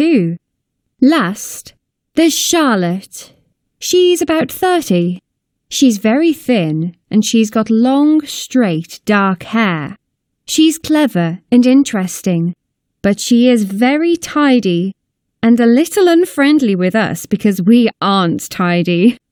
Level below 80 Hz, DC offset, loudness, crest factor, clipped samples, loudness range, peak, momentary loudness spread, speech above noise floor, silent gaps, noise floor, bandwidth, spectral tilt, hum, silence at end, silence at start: -56 dBFS; under 0.1%; -13 LUFS; 14 dB; under 0.1%; 3 LU; 0 dBFS; 10 LU; 59 dB; none; -71 dBFS; 19.5 kHz; -5 dB/octave; none; 0.15 s; 0 s